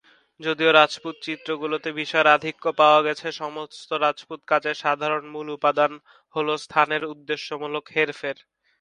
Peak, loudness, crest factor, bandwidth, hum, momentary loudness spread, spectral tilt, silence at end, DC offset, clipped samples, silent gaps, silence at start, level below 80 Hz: 0 dBFS; -23 LUFS; 24 dB; 10.5 kHz; none; 15 LU; -4 dB/octave; 0.45 s; under 0.1%; under 0.1%; none; 0.4 s; -74 dBFS